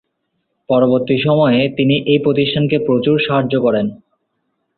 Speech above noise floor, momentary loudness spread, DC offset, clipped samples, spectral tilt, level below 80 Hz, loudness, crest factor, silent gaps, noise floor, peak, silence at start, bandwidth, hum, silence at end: 56 dB; 3 LU; under 0.1%; under 0.1%; -11.5 dB/octave; -54 dBFS; -15 LUFS; 14 dB; none; -70 dBFS; -2 dBFS; 0.7 s; 4.5 kHz; none; 0.85 s